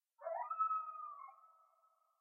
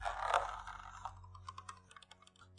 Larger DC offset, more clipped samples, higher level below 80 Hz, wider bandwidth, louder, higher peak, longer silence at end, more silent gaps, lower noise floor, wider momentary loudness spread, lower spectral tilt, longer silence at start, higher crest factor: neither; neither; second, under -90 dBFS vs -60 dBFS; second, 2.7 kHz vs 11 kHz; about the same, -42 LUFS vs -41 LUFS; second, -28 dBFS vs -16 dBFS; first, 0.7 s vs 0 s; neither; first, -76 dBFS vs -63 dBFS; second, 16 LU vs 22 LU; second, 12.5 dB/octave vs -2.5 dB/octave; first, 0.2 s vs 0 s; second, 18 dB vs 28 dB